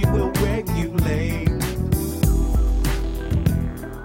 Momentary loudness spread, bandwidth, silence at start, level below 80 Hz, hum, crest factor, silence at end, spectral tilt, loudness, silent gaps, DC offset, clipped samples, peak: 4 LU; 16.5 kHz; 0 s; -24 dBFS; none; 14 dB; 0 s; -6.5 dB/octave; -22 LUFS; none; under 0.1%; under 0.1%; -6 dBFS